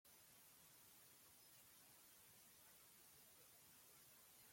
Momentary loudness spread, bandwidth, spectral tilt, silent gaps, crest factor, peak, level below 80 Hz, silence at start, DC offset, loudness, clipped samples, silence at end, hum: 0 LU; 16.5 kHz; -1 dB/octave; none; 14 dB; -54 dBFS; under -90 dBFS; 0.05 s; under 0.1%; -66 LUFS; under 0.1%; 0 s; none